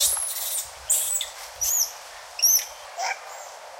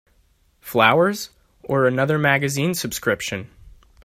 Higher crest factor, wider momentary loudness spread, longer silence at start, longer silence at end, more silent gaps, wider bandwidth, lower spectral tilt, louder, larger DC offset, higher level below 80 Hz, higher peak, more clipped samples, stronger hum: about the same, 18 dB vs 22 dB; about the same, 18 LU vs 16 LU; second, 0 s vs 0.65 s; second, 0 s vs 0.35 s; neither; about the same, 16.5 kHz vs 16 kHz; second, 3.5 dB/octave vs -4.5 dB/octave; second, -23 LUFS vs -20 LUFS; neither; second, -60 dBFS vs -54 dBFS; second, -8 dBFS vs 0 dBFS; neither; neither